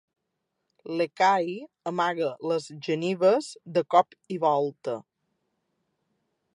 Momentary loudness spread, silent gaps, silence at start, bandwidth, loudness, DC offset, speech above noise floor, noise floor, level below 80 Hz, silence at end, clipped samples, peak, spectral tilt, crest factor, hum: 12 LU; none; 0.85 s; 11.5 kHz; -26 LUFS; under 0.1%; 55 dB; -81 dBFS; -82 dBFS; 1.55 s; under 0.1%; -6 dBFS; -5.5 dB/octave; 22 dB; none